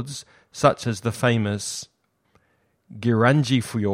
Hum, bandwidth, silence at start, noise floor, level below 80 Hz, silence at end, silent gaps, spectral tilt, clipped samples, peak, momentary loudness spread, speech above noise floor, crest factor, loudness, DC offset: none; 16 kHz; 0 s; -67 dBFS; -58 dBFS; 0 s; none; -5.5 dB/octave; under 0.1%; -2 dBFS; 17 LU; 45 dB; 20 dB; -22 LUFS; under 0.1%